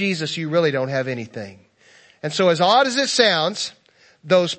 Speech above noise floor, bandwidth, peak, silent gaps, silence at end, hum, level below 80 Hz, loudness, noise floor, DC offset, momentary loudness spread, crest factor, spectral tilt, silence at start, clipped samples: 33 dB; 8.8 kHz; 0 dBFS; none; 0.05 s; none; -70 dBFS; -19 LUFS; -52 dBFS; under 0.1%; 15 LU; 20 dB; -4 dB/octave; 0 s; under 0.1%